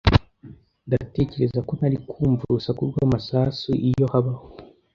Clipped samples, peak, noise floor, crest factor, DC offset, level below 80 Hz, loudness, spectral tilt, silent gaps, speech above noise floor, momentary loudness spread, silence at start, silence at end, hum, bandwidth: under 0.1%; -2 dBFS; -46 dBFS; 22 dB; under 0.1%; -36 dBFS; -23 LUFS; -8.5 dB/octave; none; 24 dB; 5 LU; 0.05 s; 0.3 s; none; 6.8 kHz